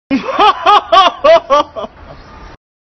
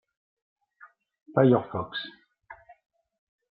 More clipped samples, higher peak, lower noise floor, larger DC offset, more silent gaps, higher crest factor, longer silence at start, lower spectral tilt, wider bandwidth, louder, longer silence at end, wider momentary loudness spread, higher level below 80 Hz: neither; first, 0 dBFS vs -6 dBFS; second, -35 dBFS vs -57 dBFS; neither; neither; second, 12 dB vs 24 dB; second, 0.1 s vs 1.35 s; second, -3.5 dB/octave vs -6 dB/octave; first, 9.2 kHz vs 5 kHz; first, -9 LUFS vs -25 LUFS; second, 0.45 s vs 1 s; about the same, 15 LU vs 15 LU; first, -42 dBFS vs -68 dBFS